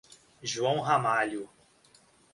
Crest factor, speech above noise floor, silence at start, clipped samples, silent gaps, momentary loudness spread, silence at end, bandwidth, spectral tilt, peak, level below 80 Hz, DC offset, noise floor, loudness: 20 dB; 33 dB; 0.1 s; under 0.1%; none; 14 LU; 0.85 s; 11.5 kHz; -4 dB/octave; -12 dBFS; -70 dBFS; under 0.1%; -62 dBFS; -29 LUFS